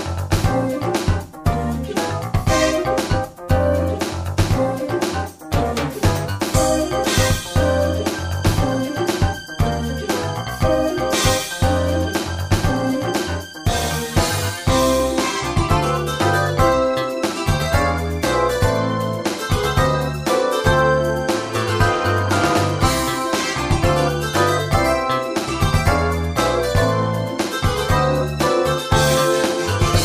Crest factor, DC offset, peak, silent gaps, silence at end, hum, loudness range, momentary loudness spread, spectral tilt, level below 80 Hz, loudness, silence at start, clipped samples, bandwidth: 18 dB; under 0.1%; -2 dBFS; none; 0 s; none; 2 LU; 5 LU; -5 dB/octave; -30 dBFS; -19 LUFS; 0 s; under 0.1%; 15.5 kHz